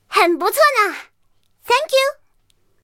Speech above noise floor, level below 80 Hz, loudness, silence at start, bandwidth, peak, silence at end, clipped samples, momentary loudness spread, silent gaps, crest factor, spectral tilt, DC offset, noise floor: 48 dB; -66 dBFS; -16 LUFS; 0.1 s; 17 kHz; 0 dBFS; 0.7 s; under 0.1%; 7 LU; none; 18 dB; -0.5 dB/octave; under 0.1%; -64 dBFS